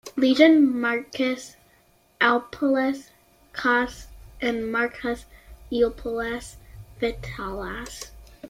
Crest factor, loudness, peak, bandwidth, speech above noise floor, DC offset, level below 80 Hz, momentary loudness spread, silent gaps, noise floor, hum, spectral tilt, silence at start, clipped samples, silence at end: 22 dB; -24 LUFS; -2 dBFS; 15.5 kHz; 37 dB; under 0.1%; -48 dBFS; 18 LU; none; -60 dBFS; none; -4.5 dB/octave; 0.05 s; under 0.1%; 0 s